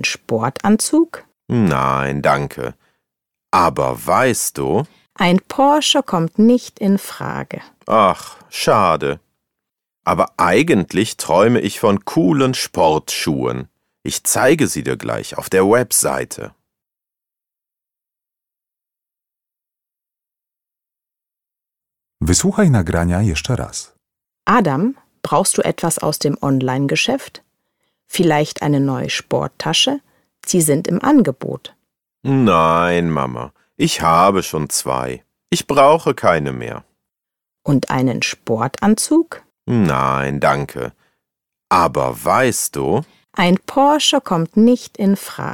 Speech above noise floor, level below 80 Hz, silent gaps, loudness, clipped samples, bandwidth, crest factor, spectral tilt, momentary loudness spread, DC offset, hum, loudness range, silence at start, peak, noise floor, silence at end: 71 dB; -44 dBFS; none; -16 LUFS; under 0.1%; 18.5 kHz; 16 dB; -4.5 dB/octave; 13 LU; under 0.1%; none; 3 LU; 0 s; 0 dBFS; -87 dBFS; 0 s